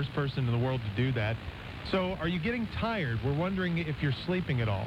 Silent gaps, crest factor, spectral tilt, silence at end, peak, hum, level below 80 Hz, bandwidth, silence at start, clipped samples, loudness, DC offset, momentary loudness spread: none; 14 dB; -8 dB/octave; 0 s; -16 dBFS; none; -48 dBFS; 9.6 kHz; 0 s; under 0.1%; -31 LUFS; under 0.1%; 3 LU